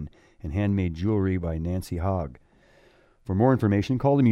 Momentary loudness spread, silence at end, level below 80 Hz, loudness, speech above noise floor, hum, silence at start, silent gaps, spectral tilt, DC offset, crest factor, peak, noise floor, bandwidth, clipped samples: 15 LU; 0 s; -44 dBFS; -25 LUFS; 35 dB; none; 0 s; none; -9 dB/octave; under 0.1%; 18 dB; -6 dBFS; -58 dBFS; 13 kHz; under 0.1%